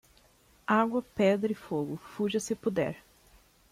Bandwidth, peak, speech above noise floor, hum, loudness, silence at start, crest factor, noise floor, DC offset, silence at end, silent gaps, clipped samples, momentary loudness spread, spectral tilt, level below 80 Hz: 15.5 kHz; -12 dBFS; 33 dB; none; -30 LUFS; 0.7 s; 18 dB; -63 dBFS; under 0.1%; 0.75 s; none; under 0.1%; 10 LU; -5.5 dB/octave; -64 dBFS